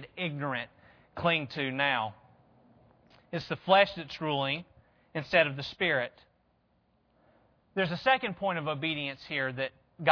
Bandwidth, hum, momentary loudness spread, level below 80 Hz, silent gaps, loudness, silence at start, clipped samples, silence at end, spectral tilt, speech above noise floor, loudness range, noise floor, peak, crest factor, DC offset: 5.4 kHz; none; 13 LU; -66 dBFS; none; -30 LUFS; 0 s; under 0.1%; 0 s; -6.5 dB/octave; 41 dB; 4 LU; -71 dBFS; -8 dBFS; 24 dB; under 0.1%